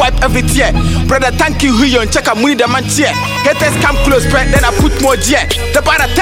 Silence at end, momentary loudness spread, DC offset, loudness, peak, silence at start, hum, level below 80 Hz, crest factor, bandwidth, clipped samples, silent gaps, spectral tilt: 0 s; 2 LU; under 0.1%; -11 LUFS; 0 dBFS; 0 s; none; -18 dBFS; 10 dB; 17 kHz; under 0.1%; none; -4 dB/octave